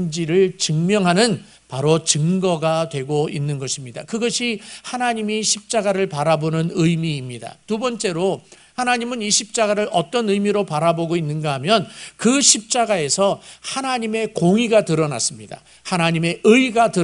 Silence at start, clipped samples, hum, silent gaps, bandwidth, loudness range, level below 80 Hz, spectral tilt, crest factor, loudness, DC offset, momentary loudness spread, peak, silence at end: 0 s; under 0.1%; none; none; 11 kHz; 4 LU; -60 dBFS; -4 dB/octave; 20 dB; -19 LUFS; under 0.1%; 12 LU; 0 dBFS; 0 s